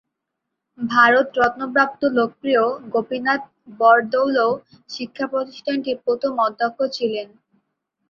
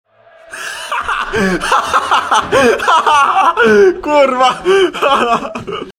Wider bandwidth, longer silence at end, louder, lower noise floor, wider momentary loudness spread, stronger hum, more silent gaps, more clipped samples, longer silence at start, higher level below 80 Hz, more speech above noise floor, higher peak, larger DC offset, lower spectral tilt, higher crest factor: second, 7.2 kHz vs 16 kHz; first, 0.85 s vs 0.1 s; second, -19 LUFS vs -11 LUFS; first, -80 dBFS vs -38 dBFS; about the same, 13 LU vs 12 LU; neither; neither; neither; first, 0.8 s vs 0.5 s; second, -64 dBFS vs -40 dBFS; first, 60 dB vs 27 dB; about the same, -2 dBFS vs 0 dBFS; neither; first, -5 dB/octave vs -3.5 dB/octave; first, 20 dB vs 12 dB